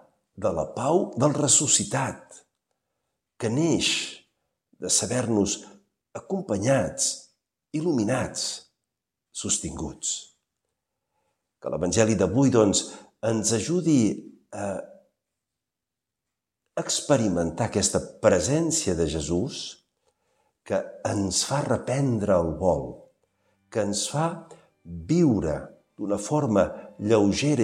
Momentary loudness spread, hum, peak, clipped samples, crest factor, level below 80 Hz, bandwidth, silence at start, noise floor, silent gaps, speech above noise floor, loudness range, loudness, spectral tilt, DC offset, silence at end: 14 LU; none; -4 dBFS; under 0.1%; 22 dB; -52 dBFS; 15.5 kHz; 0.35 s; -87 dBFS; none; 62 dB; 5 LU; -25 LUFS; -4.5 dB/octave; under 0.1%; 0 s